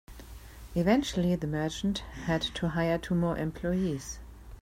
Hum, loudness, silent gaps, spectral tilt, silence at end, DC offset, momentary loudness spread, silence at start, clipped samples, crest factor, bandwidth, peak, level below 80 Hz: none; -30 LUFS; none; -6 dB/octave; 0 s; under 0.1%; 21 LU; 0.1 s; under 0.1%; 18 dB; 16 kHz; -14 dBFS; -46 dBFS